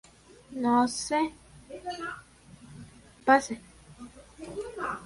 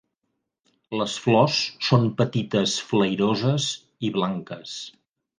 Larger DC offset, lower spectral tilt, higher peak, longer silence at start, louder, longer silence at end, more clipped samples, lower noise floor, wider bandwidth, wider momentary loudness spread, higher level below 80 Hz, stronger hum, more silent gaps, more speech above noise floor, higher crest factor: neither; second, -3.5 dB/octave vs -5 dB/octave; second, -8 dBFS vs -4 dBFS; second, 0.5 s vs 0.9 s; second, -28 LUFS vs -23 LUFS; second, 0 s vs 0.5 s; neither; second, -53 dBFS vs -78 dBFS; first, 11.5 kHz vs 10 kHz; first, 25 LU vs 14 LU; about the same, -60 dBFS vs -64 dBFS; neither; neither; second, 25 dB vs 56 dB; about the same, 24 dB vs 20 dB